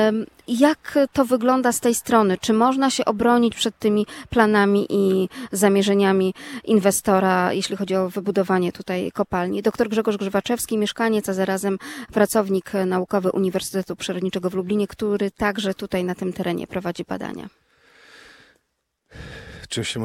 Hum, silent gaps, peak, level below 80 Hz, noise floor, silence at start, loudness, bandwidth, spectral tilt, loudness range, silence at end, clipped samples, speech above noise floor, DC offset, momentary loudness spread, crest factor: none; none; -2 dBFS; -54 dBFS; -74 dBFS; 0 s; -21 LUFS; 16.5 kHz; -5 dB/octave; 8 LU; 0 s; under 0.1%; 53 dB; under 0.1%; 10 LU; 20 dB